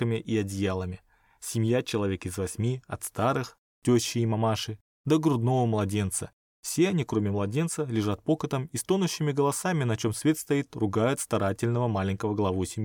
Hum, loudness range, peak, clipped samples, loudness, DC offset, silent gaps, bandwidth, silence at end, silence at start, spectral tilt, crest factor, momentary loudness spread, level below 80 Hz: none; 2 LU; -12 dBFS; under 0.1%; -28 LUFS; under 0.1%; 3.58-3.82 s, 4.81-5.04 s, 6.33-6.63 s; 19 kHz; 0 s; 0 s; -5.5 dB/octave; 16 dB; 8 LU; -60 dBFS